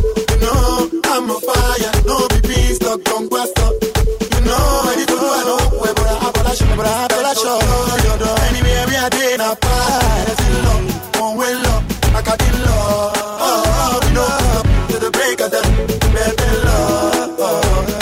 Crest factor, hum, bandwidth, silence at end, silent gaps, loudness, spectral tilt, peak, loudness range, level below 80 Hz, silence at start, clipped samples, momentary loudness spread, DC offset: 12 dB; none; 16.5 kHz; 0 s; none; -15 LUFS; -4.5 dB/octave; -2 dBFS; 1 LU; -18 dBFS; 0 s; under 0.1%; 3 LU; under 0.1%